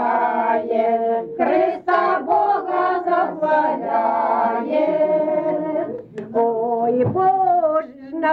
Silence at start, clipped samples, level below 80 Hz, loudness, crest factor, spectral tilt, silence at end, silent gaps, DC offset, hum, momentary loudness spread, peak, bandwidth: 0 s; under 0.1%; -64 dBFS; -19 LUFS; 12 dB; -8.5 dB/octave; 0 s; none; under 0.1%; none; 5 LU; -6 dBFS; 5.4 kHz